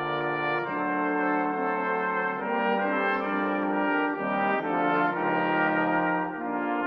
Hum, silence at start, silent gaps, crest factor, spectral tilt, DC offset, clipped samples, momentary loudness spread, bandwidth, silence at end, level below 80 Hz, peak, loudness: none; 0 s; none; 14 dB; -8.5 dB/octave; under 0.1%; under 0.1%; 4 LU; 5.6 kHz; 0 s; -66 dBFS; -14 dBFS; -26 LUFS